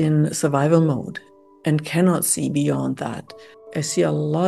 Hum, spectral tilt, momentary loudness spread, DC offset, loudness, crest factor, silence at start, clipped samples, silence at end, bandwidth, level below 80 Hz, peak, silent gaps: none; -5.5 dB/octave; 13 LU; under 0.1%; -21 LUFS; 16 dB; 0 s; under 0.1%; 0 s; 12.5 kHz; -62 dBFS; -4 dBFS; none